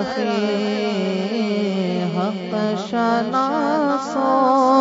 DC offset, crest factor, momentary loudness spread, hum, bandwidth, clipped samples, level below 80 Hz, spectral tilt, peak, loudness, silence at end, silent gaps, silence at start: under 0.1%; 14 dB; 6 LU; none; 7.8 kHz; under 0.1%; -66 dBFS; -6 dB/octave; -4 dBFS; -20 LUFS; 0 s; none; 0 s